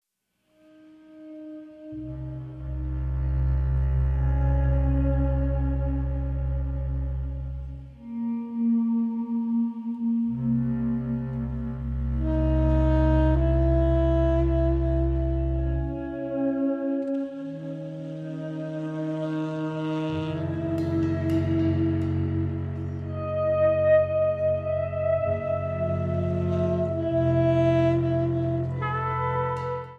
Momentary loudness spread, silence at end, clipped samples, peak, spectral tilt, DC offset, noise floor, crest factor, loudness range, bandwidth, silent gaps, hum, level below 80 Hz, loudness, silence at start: 12 LU; 0 s; under 0.1%; -10 dBFS; -10 dB/octave; under 0.1%; -74 dBFS; 14 dB; 7 LU; 4.9 kHz; none; none; -30 dBFS; -26 LUFS; 1.1 s